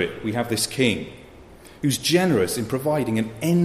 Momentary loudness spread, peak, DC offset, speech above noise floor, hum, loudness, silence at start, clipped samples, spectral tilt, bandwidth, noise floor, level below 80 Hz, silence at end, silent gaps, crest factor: 8 LU; -6 dBFS; under 0.1%; 23 dB; none; -22 LUFS; 0 s; under 0.1%; -4.5 dB/octave; 15.5 kHz; -45 dBFS; -52 dBFS; 0 s; none; 16 dB